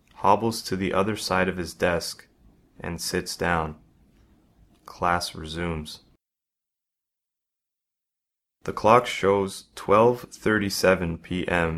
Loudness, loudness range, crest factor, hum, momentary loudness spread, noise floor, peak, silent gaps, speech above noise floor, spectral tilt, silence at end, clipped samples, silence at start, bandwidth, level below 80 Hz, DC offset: -24 LUFS; 10 LU; 24 dB; none; 16 LU; -88 dBFS; -2 dBFS; none; 64 dB; -4.5 dB/octave; 0 s; under 0.1%; 0.2 s; 16 kHz; -50 dBFS; under 0.1%